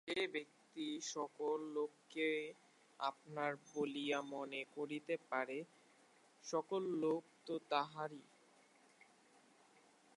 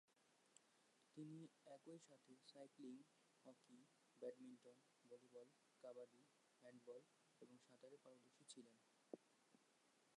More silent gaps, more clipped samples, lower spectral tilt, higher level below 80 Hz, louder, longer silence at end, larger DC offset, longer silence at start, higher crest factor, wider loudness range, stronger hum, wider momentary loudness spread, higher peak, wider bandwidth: neither; neither; about the same, -4 dB/octave vs -5 dB/octave; about the same, under -90 dBFS vs under -90 dBFS; first, -43 LUFS vs -64 LUFS; first, 1.95 s vs 0 s; neither; about the same, 0.05 s vs 0.1 s; about the same, 22 dB vs 26 dB; about the same, 1 LU vs 3 LU; neither; about the same, 8 LU vs 10 LU; first, -22 dBFS vs -40 dBFS; about the same, 11.5 kHz vs 11 kHz